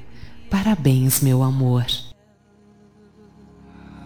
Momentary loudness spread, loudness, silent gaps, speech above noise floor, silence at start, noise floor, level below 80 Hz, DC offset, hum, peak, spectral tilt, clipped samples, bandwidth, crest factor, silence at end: 8 LU; -19 LUFS; none; 38 dB; 0 s; -55 dBFS; -44 dBFS; under 0.1%; none; -4 dBFS; -5.5 dB/octave; under 0.1%; 19 kHz; 18 dB; 0 s